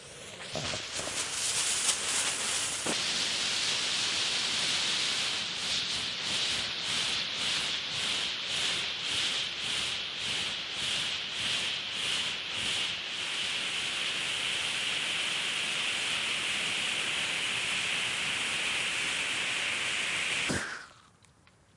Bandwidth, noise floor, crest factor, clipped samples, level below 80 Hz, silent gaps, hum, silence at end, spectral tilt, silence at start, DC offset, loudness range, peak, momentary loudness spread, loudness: 12 kHz; -62 dBFS; 20 dB; under 0.1%; -64 dBFS; none; none; 0.75 s; 0 dB/octave; 0 s; under 0.1%; 2 LU; -12 dBFS; 4 LU; -29 LUFS